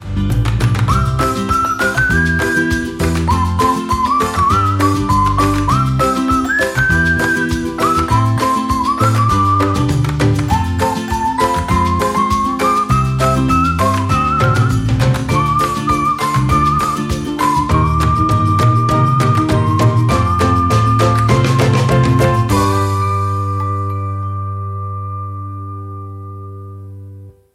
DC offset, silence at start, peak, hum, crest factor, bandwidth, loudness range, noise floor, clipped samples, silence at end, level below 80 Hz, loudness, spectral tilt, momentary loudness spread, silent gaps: under 0.1%; 0 s; 0 dBFS; none; 14 dB; 15.5 kHz; 4 LU; -35 dBFS; under 0.1%; 0.25 s; -28 dBFS; -14 LUFS; -6 dB/octave; 9 LU; none